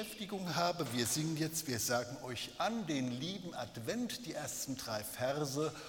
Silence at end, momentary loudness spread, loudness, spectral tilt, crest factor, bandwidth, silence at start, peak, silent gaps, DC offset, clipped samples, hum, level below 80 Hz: 0 s; 7 LU; -38 LUFS; -3.5 dB/octave; 20 dB; 19 kHz; 0 s; -18 dBFS; none; under 0.1%; under 0.1%; none; -68 dBFS